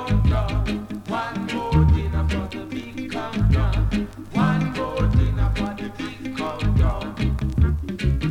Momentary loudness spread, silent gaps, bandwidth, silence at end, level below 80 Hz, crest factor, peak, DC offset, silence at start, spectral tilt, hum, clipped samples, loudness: 10 LU; none; 11 kHz; 0 s; -26 dBFS; 14 dB; -6 dBFS; under 0.1%; 0 s; -7.5 dB/octave; none; under 0.1%; -23 LUFS